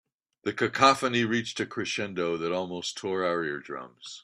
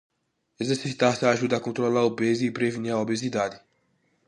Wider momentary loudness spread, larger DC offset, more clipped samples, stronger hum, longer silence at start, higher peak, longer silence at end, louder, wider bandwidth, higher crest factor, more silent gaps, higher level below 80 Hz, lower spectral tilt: first, 15 LU vs 6 LU; neither; neither; neither; second, 0.45 s vs 0.6 s; about the same, -4 dBFS vs -6 dBFS; second, 0.05 s vs 0.7 s; second, -28 LUFS vs -25 LUFS; first, 14 kHz vs 11.5 kHz; about the same, 24 dB vs 20 dB; neither; about the same, -70 dBFS vs -68 dBFS; second, -4 dB/octave vs -5.5 dB/octave